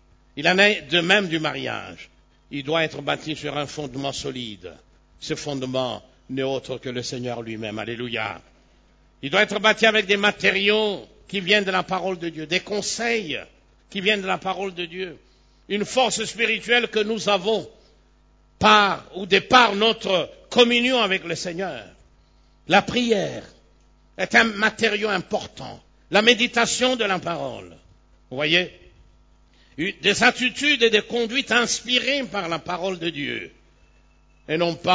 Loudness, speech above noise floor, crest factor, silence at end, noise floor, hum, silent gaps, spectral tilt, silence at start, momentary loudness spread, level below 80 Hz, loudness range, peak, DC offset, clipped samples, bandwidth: -21 LUFS; 35 dB; 22 dB; 0 s; -57 dBFS; none; none; -3 dB/octave; 0.35 s; 15 LU; -54 dBFS; 9 LU; 0 dBFS; under 0.1%; under 0.1%; 8 kHz